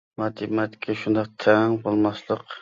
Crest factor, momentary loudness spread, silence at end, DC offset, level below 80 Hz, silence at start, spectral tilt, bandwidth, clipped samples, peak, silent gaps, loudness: 20 dB; 10 LU; 0.05 s; under 0.1%; -62 dBFS; 0.2 s; -7.5 dB/octave; 7.4 kHz; under 0.1%; -4 dBFS; none; -24 LUFS